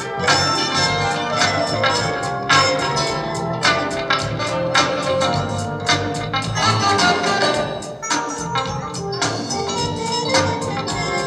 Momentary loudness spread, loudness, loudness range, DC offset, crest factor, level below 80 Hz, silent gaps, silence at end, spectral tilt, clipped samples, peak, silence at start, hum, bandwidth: 7 LU; -19 LUFS; 3 LU; under 0.1%; 18 dB; -46 dBFS; none; 0 s; -3.5 dB/octave; under 0.1%; -2 dBFS; 0 s; none; 13.5 kHz